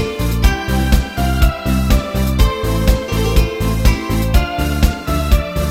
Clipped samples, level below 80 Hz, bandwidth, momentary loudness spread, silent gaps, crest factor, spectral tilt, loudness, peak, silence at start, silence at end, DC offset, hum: under 0.1%; -16 dBFS; 16.5 kHz; 2 LU; none; 14 dB; -5.5 dB/octave; -16 LUFS; 0 dBFS; 0 s; 0 s; under 0.1%; none